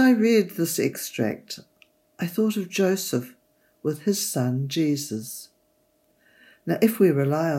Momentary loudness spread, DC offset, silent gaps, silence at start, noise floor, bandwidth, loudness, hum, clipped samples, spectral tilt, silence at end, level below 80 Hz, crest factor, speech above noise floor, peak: 16 LU; under 0.1%; none; 0 s; -66 dBFS; 16.5 kHz; -24 LUFS; none; under 0.1%; -5.5 dB/octave; 0 s; -76 dBFS; 18 dB; 43 dB; -6 dBFS